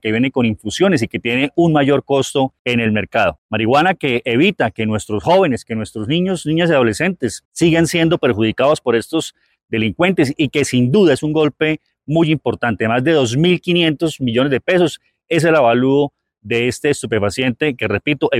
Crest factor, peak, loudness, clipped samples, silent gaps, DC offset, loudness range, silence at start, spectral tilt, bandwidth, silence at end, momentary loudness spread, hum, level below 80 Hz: 12 dB; -2 dBFS; -16 LUFS; under 0.1%; 2.59-2.65 s, 3.38-3.49 s, 7.45-7.51 s; under 0.1%; 1 LU; 0.05 s; -5.5 dB/octave; 15 kHz; 0 s; 6 LU; none; -50 dBFS